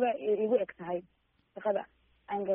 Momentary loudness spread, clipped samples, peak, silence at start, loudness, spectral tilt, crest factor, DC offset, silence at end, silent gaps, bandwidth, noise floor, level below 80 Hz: 13 LU; under 0.1%; -16 dBFS; 0 s; -33 LUFS; -5 dB/octave; 16 dB; under 0.1%; 0 s; none; 3.6 kHz; -72 dBFS; -74 dBFS